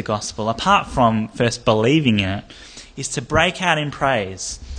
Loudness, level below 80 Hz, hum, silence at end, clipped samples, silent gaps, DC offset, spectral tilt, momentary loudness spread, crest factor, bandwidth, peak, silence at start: -19 LUFS; -40 dBFS; none; 0 s; under 0.1%; none; under 0.1%; -4.5 dB/octave; 13 LU; 18 dB; 10 kHz; 0 dBFS; 0 s